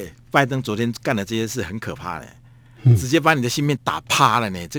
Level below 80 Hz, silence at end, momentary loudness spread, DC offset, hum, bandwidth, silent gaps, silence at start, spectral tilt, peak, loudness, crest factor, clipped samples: -50 dBFS; 0 s; 13 LU; under 0.1%; none; over 20 kHz; none; 0 s; -5 dB/octave; 0 dBFS; -20 LUFS; 20 dB; under 0.1%